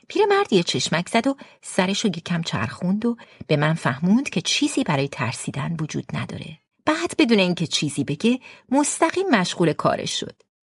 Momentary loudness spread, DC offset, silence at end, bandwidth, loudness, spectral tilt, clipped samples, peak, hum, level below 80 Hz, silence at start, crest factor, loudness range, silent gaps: 9 LU; under 0.1%; 0.3 s; 11.5 kHz; -22 LUFS; -4.5 dB/octave; under 0.1%; -4 dBFS; none; -60 dBFS; 0.1 s; 18 dB; 3 LU; none